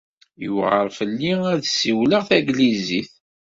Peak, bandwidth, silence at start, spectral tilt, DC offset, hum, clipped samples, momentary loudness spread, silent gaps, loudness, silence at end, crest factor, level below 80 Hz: -2 dBFS; 7.8 kHz; 0.4 s; -4.5 dB/octave; under 0.1%; none; under 0.1%; 9 LU; none; -20 LUFS; 0.4 s; 18 dB; -60 dBFS